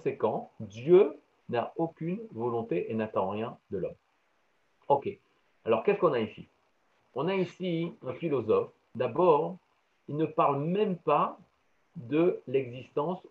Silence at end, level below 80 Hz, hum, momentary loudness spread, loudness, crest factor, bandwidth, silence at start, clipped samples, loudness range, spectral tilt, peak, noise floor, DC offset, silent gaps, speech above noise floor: 0.1 s; -76 dBFS; none; 13 LU; -30 LUFS; 20 dB; 6.6 kHz; 0.05 s; under 0.1%; 5 LU; -9 dB/octave; -10 dBFS; -73 dBFS; under 0.1%; none; 44 dB